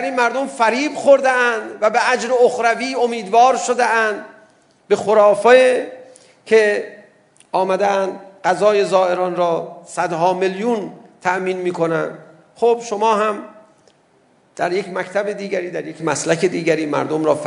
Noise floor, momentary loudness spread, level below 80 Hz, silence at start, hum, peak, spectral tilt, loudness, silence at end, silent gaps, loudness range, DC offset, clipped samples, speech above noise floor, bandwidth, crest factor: -56 dBFS; 11 LU; -72 dBFS; 0 s; none; 0 dBFS; -4 dB/octave; -17 LUFS; 0 s; none; 6 LU; under 0.1%; under 0.1%; 39 dB; 11 kHz; 18 dB